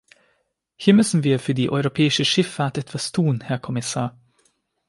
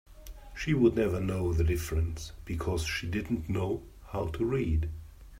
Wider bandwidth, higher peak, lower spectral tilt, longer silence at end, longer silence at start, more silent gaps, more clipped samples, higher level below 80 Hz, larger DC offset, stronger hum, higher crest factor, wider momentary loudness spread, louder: second, 11.5 kHz vs 16 kHz; first, -4 dBFS vs -12 dBFS; second, -5 dB/octave vs -6.5 dB/octave; first, 0.8 s vs 0 s; first, 0.8 s vs 0.1 s; neither; neither; second, -60 dBFS vs -40 dBFS; neither; neither; about the same, 18 dB vs 18 dB; second, 10 LU vs 14 LU; first, -21 LUFS vs -31 LUFS